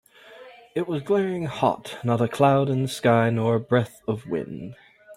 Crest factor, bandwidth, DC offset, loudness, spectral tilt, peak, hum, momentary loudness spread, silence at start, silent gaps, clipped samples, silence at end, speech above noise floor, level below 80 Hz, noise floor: 18 dB; 16 kHz; under 0.1%; -24 LUFS; -7 dB/octave; -6 dBFS; none; 11 LU; 0.3 s; none; under 0.1%; 0 s; 24 dB; -62 dBFS; -47 dBFS